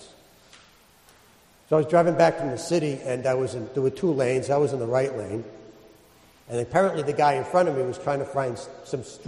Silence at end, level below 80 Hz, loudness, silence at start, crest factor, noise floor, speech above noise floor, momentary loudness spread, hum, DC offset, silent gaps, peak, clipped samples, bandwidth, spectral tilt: 0 s; -62 dBFS; -24 LUFS; 0 s; 20 dB; -56 dBFS; 32 dB; 13 LU; none; under 0.1%; none; -6 dBFS; under 0.1%; 12.5 kHz; -6 dB/octave